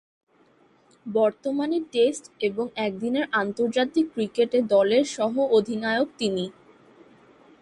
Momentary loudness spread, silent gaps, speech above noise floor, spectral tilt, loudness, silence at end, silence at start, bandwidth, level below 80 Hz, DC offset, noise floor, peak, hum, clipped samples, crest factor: 8 LU; none; 36 dB; -4.5 dB/octave; -24 LUFS; 1.1 s; 1.05 s; 11.5 kHz; -70 dBFS; under 0.1%; -60 dBFS; -8 dBFS; none; under 0.1%; 16 dB